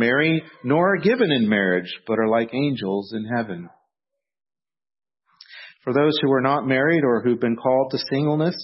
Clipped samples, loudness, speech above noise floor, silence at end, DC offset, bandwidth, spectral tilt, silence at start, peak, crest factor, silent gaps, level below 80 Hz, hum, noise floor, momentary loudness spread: under 0.1%; -21 LUFS; 64 dB; 0 s; under 0.1%; 6 kHz; -9.5 dB/octave; 0 s; -4 dBFS; 18 dB; none; -68 dBFS; none; -85 dBFS; 8 LU